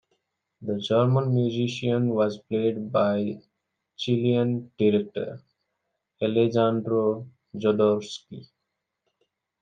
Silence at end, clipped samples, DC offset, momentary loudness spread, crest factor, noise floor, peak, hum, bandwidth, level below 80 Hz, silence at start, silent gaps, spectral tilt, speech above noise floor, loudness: 1.15 s; under 0.1%; under 0.1%; 14 LU; 18 dB; -82 dBFS; -8 dBFS; none; 8.8 kHz; -72 dBFS; 0.6 s; none; -7.5 dB/octave; 58 dB; -25 LUFS